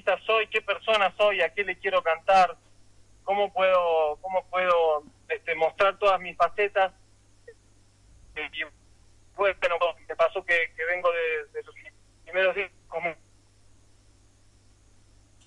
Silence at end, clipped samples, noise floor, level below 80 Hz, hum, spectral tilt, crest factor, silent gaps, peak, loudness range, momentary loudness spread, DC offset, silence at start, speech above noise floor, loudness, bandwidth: 2.3 s; under 0.1%; -58 dBFS; -60 dBFS; none; -3.5 dB/octave; 16 dB; none; -12 dBFS; 7 LU; 12 LU; under 0.1%; 0.05 s; 33 dB; -25 LUFS; 11 kHz